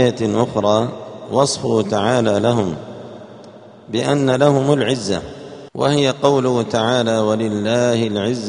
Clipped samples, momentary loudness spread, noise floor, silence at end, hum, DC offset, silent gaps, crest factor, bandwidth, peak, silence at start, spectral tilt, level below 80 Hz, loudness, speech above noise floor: under 0.1%; 16 LU; -40 dBFS; 0 s; none; under 0.1%; none; 18 dB; 10.5 kHz; 0 dBFS; 0 s; -5.5 dB/octave; -54 dBFS; -17 LUFS; 23 dB